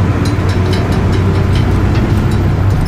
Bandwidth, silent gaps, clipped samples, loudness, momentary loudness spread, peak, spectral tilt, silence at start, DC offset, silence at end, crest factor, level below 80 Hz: 14 kHz; none; under 0.1%; -13 LUFS; 1 LU; -2 dBFS; -7.5 dB/octave; 0 s; under 0.1%; 0 s; 10 dB; -20 dBFS